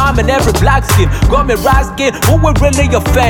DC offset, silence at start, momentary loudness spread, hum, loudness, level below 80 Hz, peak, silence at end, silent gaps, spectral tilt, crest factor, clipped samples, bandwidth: under 0.1%; 0 s; 2 LU; none; -11 LUFS; -16 dBFS; 0 dBFS; 0 s; none; -5 dB/octave; 10 dB; under 0.1%; 18 kHz